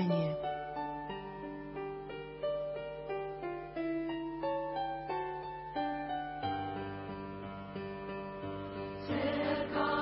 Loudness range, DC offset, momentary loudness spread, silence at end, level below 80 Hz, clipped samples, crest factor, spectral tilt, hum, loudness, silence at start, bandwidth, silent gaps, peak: 3 LU; under 0.1%; 10 LU; 0 s; -60 dBFS; under 0.1%; 16 dB; -5 dB/octave; none; -39 LUFS; 0 s; 5.6 kHz; none; -22 dBFS